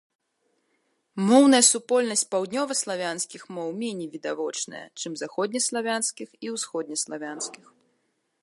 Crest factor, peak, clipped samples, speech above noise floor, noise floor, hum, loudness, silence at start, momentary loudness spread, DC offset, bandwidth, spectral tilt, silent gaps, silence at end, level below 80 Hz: 22 dB; -4 dBFS; under 0.1%; 48 dB; -73 dBFS; none; -25 LUFS; 1.15 s; 17 LU; under 0.1%; 11.5 kHz; -2.5 dB/octave; none; 0.85 s; -80 dBFS